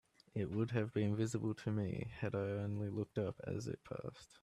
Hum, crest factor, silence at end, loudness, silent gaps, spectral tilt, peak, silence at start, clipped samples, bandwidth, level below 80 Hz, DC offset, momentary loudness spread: none; 16 dB; 0.15 s; -41 LUFS; none; -7.5 dB/octave; -24 dBFS; 0.35 s; under 0.1%; 11.5 kHz; -68 dBFS; under 0.1%; 9 LU